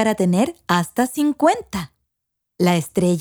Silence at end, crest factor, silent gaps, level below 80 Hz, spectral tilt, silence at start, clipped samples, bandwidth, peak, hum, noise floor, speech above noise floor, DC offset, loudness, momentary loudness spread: 0 s; 16 dB; none; -54 dBFS; -6 dB/octave; 0 s; under 0.1%; over 20 kHz; -4 dBFS; none; -79 dBFS; 60 dB; under 0.1%; -20 LUFS; 10 LU